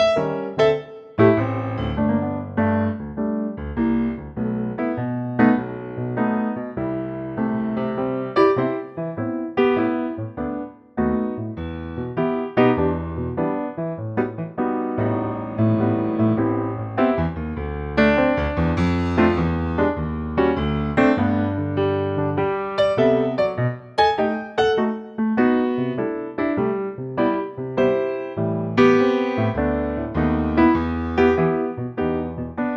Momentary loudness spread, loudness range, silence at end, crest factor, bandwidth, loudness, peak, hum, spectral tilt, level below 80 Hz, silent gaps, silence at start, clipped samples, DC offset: 9 LU; 3 LU; 0 s; 16 dB; 7.4 kHz; -22 LUFS; -4 dBFS; none; -8.5 dB/octave; -40 dBFS; none; 0 s; under 0.1%; under 0.1%